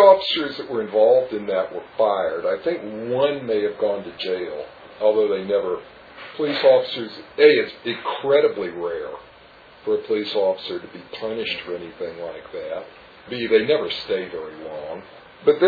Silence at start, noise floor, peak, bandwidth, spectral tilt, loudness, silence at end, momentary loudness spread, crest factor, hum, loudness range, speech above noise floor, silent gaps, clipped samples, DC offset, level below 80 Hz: 0 s; -47 dBFS; -2 dBFS; 4.9 kHz; -6.5 dB/octave; -22 LUFS; 0 s; 17 LU; 20 dB; none; 7 LU; 26 dB; none; under 0.1%; under 0.1%; -62 dBFS